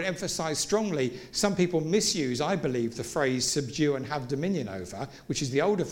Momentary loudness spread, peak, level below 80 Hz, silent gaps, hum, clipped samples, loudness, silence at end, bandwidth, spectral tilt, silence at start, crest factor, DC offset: 7 LU; -12 dBFS; -58 dBFS; none; none; under 0.1%; -28 LUFS; 0 s; 17 kHz; -4 dB/octave; 0 s; 18 dB; under 0.1%